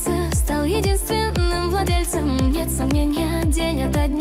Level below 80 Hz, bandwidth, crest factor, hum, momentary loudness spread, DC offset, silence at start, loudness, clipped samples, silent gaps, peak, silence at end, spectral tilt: -24 dBFS; 16 kHz; 10 dB; none; 1 LU; under 0.1%; 0 s; -21 LUFS; under 0.1%; none; -8 dBFS; 0 s; -5.5 dB/octave